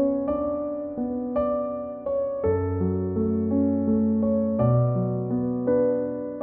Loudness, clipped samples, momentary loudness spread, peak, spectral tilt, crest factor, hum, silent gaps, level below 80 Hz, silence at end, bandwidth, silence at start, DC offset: -25 LUFS; under 0.1%; 7 LU; -10 dBFS; -12 dB/octave; 14 dB; none; none; -52 dBFS; 0 s; 3.2 kHz; 0 s; under 0.1%